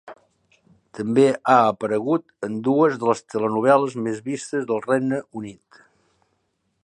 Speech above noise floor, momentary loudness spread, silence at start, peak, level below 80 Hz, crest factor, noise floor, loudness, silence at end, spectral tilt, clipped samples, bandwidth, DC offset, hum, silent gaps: 51 dB; 12 LU; 0.05 s; -2 dBFS; -68 dBFS; 20 dB; -71 dBFS; -21 LUFS; 1.3 s; -6.5 dB/octave; under 0.1%; 10.5 kHz; under 0.1%; none; none